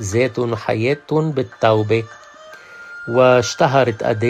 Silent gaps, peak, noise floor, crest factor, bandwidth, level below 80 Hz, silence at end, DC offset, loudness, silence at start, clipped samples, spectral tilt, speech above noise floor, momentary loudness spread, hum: none; 0 dBFS; -40 dBFS; 16 dB; 14 kHz; -56 dBFS; 0 s; under 0.1%; -17 LUFS; 0 s; under 0.1%; -5.5 dB/octave; 23 dB; 15 LU; none